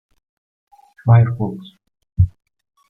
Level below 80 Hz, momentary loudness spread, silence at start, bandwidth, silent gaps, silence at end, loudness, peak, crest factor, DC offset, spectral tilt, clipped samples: -40 dBFS; 16 LU; 1.05 s; 3.8 kHz; none; 0.6 s; -17 LUFS; -2 dBFS; 18 dB; under 0.1%; -11 dB/octave; under 0.1%